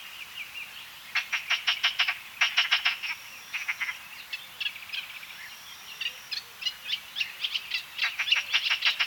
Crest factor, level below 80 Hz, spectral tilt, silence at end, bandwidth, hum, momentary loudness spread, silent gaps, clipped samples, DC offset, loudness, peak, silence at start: 24 dB; -74 dBFS; 2.5 dB/octave; 0 s; 19 kHz; none; 16 LU; none; under 0.1%; under 0.1%; -28 LUFS; -8 dBFS; 0 s